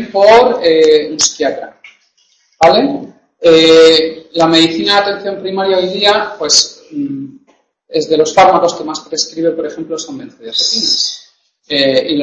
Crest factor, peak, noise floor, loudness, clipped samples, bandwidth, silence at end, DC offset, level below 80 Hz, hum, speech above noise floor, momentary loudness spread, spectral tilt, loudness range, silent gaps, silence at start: 12 dB; 0 dBFS; -55 dBFS; -11 LUFS; 0.2%; 11 kHz; 0 s; under 0.1%; -50 dBFS; none; 44 dB; 15 LU; -2.5 dB/octave; 5 LU; none; 0 s